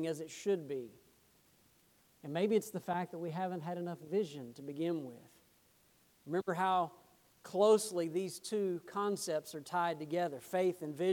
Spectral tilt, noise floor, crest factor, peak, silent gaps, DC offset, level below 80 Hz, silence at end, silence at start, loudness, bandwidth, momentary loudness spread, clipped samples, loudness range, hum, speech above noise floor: -5 dB/octave; -69 dBFS; 20 dB; -16 dBFS; none; under 0.1%; -82 dBFS; 0 s; 0 s; -37 LUFS; 19 kHz; 10 LU; under 0.1%; 6 LU; none; 34 dB